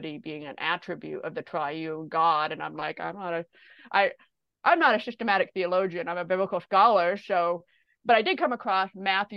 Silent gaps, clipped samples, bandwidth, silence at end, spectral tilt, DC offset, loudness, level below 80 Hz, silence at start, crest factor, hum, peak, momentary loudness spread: none; under 0.1%; 6.4 kHz; 0 s; -6.5 dB/octave; under 0.1%; -26 LUFS; -78 dBFS; 0 s; 20 dB; none; -8 dBFS; 14 LU